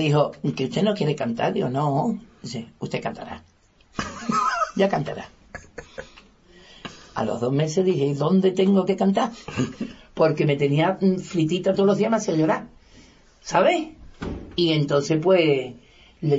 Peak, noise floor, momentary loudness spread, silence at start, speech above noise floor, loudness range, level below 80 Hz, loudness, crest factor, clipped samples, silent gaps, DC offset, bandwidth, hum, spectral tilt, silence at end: -6 dBFS; -51 dBFS; 18 LU; 0 s; 30 dB; 6 LU; -54 dBFS; -22 LUFS; 16 dB; under 0.1%; none; under 0.1%; 8 kHz; none; -6.5 dB/octave; 0 s